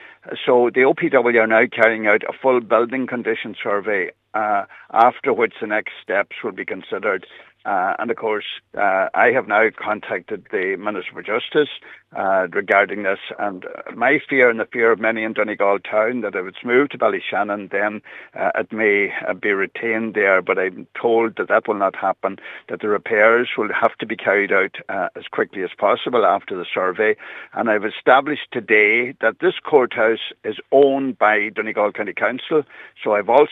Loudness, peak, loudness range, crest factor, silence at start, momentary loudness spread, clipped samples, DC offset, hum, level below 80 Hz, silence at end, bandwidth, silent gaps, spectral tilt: -19 LUFS; 0 dBFS; 4 LU; 18 dB; 0 s; 11 LU; under 0.1%; under 0.1%; none; -76 dBFS; 0 s; 4.1 kHz; none; -7 dB/octave